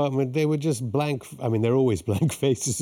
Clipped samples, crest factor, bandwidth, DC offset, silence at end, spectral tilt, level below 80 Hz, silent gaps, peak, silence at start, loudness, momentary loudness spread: under 0.1%; 14 dB; 17 kHz; under 0.1%; 0 s; -6 dB/octave; -60 dBFS; none; -10 dBFS; 0 s; -24 LUFS; 5 LU